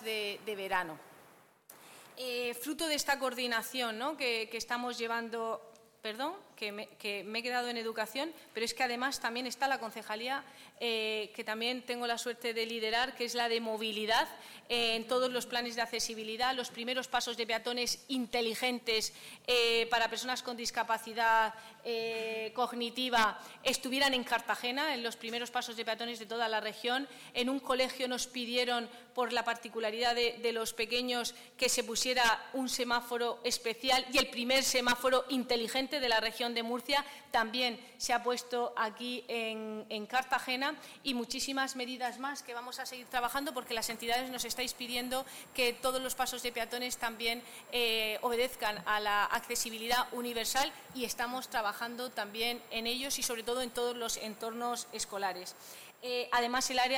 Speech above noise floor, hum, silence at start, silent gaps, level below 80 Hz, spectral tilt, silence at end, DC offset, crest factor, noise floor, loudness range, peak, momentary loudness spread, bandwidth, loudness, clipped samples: 27 dB; none; 0 s; none; -68 dBFS; -1 dB/octave; 0 s; under 0.1%; 18 dB; -61 dBFS; 5 LU; -18 dBFS; 9 LU; 19 kHz; -34 LUFS; under 0.1%